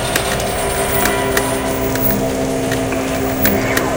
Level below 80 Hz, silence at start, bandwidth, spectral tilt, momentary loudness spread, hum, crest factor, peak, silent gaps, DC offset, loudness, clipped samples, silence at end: -32 dBFS; 0 s; 17.5 kHz; -4 dB/octave; 4 LU; none; 16 dB; 0 dBFS; none; 0.2%; -16 LUFS; under 0.1%; 0 s